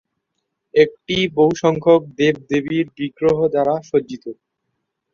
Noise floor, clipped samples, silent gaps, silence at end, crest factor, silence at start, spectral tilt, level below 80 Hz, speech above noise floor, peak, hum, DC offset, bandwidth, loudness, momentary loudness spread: -76 dBFS; under 0.1%; none; 0.8 s; 16 dB; 0.75 s; -6 dB/octave; -54 dBFS; 58 dB; -2 dBFS; none; under 0.1%; 7.2 kHz; -18 LUFS; 8 LU